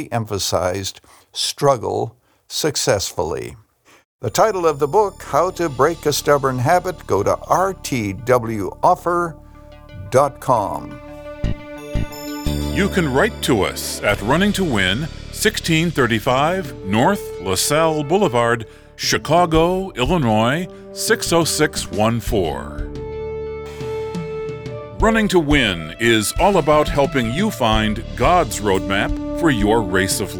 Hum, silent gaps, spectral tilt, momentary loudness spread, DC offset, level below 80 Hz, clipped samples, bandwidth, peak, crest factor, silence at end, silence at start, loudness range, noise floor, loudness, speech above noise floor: none; 4.05-4.19 s; -4.5 dB/octave; 12 LU; under 0.1%; -34 dBFS; under 0.1%; over 20 kHz; -2 dBFS; 18 dB; 0 s; 0 s; 4 LU; -41 dBFS; -18 LUFS; 23 dB